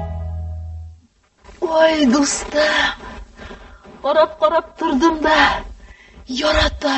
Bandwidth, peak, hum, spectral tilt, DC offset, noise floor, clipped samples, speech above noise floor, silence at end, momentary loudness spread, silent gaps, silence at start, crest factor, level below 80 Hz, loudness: 8.6 kHz; -2 dBFS; none; -3.5 dB/octave; under 0.1%; -53 dBFS; under 0.1%; 37 dB; 0 s; 21 LU; none; 0 s; 18 dB; -34 dBFS; -17 LUFS